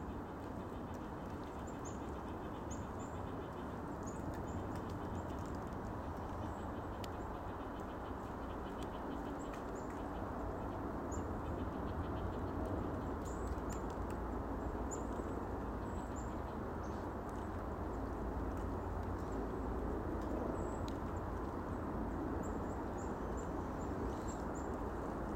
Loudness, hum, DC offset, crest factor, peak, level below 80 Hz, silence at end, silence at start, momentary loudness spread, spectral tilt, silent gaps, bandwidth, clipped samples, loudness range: -43 LUFS; none; under 0.1%; 16 dB; -26 dBFS; -50 dBFS; 0 s; 0 s; 4 LU; -7 dB/octave; none; 16 kHz; under 0.1%; 3 LU